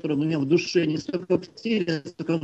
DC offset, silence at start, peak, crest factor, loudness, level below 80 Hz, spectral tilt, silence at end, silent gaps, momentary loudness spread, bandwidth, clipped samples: under 0.1%; 0.05 s; -10 dBFS; 16 dB; -25 LUFS; -64 dBFS; -6.5 dB/octave; 0 s; none; 7 LU; 8.2 kHz; under 0.1%